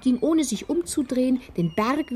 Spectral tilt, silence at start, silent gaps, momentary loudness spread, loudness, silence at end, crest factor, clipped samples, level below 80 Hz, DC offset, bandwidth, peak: -5.5 dB/octave; 0 s; none; 4 LU; -24 LUFS; 0 s; 14 dB; under 0.1%; -52 dBFS; under 0.1%; 15 kHz; -10 dBFS